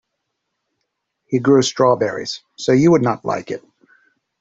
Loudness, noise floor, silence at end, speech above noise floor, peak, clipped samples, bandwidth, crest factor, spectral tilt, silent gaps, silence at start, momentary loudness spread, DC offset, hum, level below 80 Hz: -17 LUFS; -76 dBFS; 0.85 s; 59 dB; -2 dBFS; under 0.1%; 7.8 kHz; 16 dB; -5.5 dB/octave; none; 1.3 s; 14 LU; under 0.1%; none; -58 dBFS